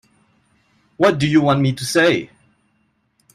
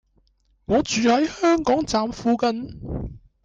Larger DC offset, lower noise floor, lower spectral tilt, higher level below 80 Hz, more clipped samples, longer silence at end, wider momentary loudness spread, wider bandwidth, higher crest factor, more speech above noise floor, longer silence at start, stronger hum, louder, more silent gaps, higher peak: neither; about the same, -65 dBFS vs -63 dBFS; about the same, -5.5 dB/octave vs -4.5 dB/octave; second, -54 dBFS vs -44 dBFS; neither; first, 1.1 s vs 0.25 s; second, 6 LU vs 13 LU; first, 14.5 kHz vs 9.2 kHz; first, 18 dB vs 12 dB; first, 49 dB vs 42 dB; first, 1 s vs 0.7 s; neither; first, -16 LUFS vs -22 LUFS; neither; first, -2 dBFS vs -10 dBFS